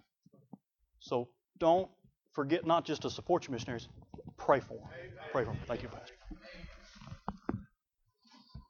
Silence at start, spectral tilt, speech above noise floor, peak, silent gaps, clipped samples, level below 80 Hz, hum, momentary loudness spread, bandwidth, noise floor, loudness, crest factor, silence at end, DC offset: 1 s; -6 dB/octave; 46 dB; -12 dBFS; none; under 0.1%; -60 dBFS; none; 22 LU; 7.2 kHz; -80 dBFS; -35 LUFS; 24 dB; 0.1 s; under 0.1%